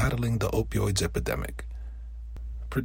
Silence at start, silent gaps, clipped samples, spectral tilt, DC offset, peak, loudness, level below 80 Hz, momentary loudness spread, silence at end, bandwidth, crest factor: 0 s; none; under 0.1%; -5.5 dB/octave; under 0.1%; -12 dBFS; -29 LUFS; -36 dBFS; 15 LU; 0 s; 16.5 kHz; 18 dB